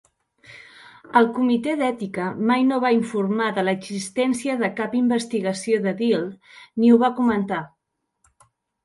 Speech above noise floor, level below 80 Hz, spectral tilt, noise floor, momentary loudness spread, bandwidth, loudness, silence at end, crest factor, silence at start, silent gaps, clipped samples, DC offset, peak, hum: 49 dB; -66 dBFS; -5.5 dB/octave; -70 dBFS; 10 LU; 11.5 kHz; -21 LUFS; 1.2 s; 18 dB; 0.5 s; none; under 0.1%; under 0.1%; -4 dBFS; none